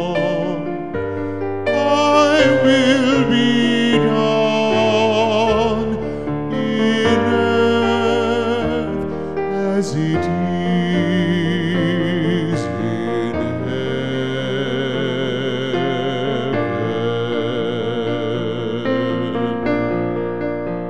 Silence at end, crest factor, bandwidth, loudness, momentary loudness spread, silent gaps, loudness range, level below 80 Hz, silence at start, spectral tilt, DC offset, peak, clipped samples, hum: 0 s; 16 dB; 11 kHz; -18 LUFS; 8 LU; none; 6 LU; -46 dBFS; 0 s; -6 dB/octave; 1%; 0 dBFS; under 0.1%; none